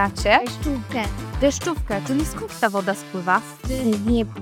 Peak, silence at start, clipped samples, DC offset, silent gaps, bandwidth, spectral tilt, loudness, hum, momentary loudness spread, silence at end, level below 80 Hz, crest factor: -2 dBFS; 0 s; under 0.1%; under 0.1%; none; 18 kHz; -5 dB/octave; -22 LUFS; none; 8 LU; 0 s; -34 dBFS; 20 dB